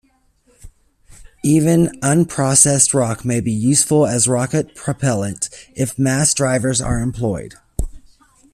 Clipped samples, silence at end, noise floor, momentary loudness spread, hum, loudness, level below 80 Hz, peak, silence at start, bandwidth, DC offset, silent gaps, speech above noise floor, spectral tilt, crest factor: under 0.1%; 0.55 s; -58 dBFS; 13 LU; none; -16 LUFS; -36 dBFS; 0 dBFS; 0.65 s; 14.5 kHz; under 0.1%; none; 41 dB; -4.5 dB/octave; 18 dB